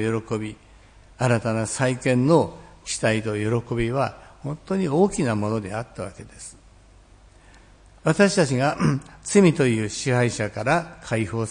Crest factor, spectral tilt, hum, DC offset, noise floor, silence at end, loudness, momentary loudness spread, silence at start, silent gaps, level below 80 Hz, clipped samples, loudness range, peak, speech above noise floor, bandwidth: 20 dB; -5.5 dB/octave; none; under 0.1%; -51 dBFS; 0 s; -23 LUFS; 16 LU; 0 s; none; -50 dBFS; under 0.1%; 6 LU; -4 dBFS; 29 dB; 10.5 kHz